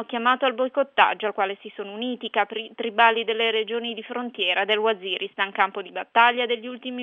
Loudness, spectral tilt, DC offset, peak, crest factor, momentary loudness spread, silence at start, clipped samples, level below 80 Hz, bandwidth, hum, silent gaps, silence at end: -23 LUFS; -5 dB/octave; under 0.1%; -4 dBFS; 20 dB; 12 LU; 0 s; under 0.1%; -84 dBFS; 6.8 kHz; none; none; 0 s